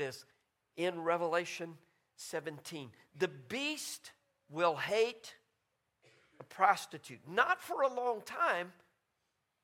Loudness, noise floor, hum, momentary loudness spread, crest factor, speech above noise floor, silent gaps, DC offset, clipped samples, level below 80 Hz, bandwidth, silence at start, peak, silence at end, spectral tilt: -35 LUFS; -83 dBFS; none; 18 LU; 24 dB; 47 dB; none; under 0.1%; under 0.1%; -84 dBFS; 16.5 kHz; 0 s; -14 dBFS; 0.9 s; -3.5 dB/octave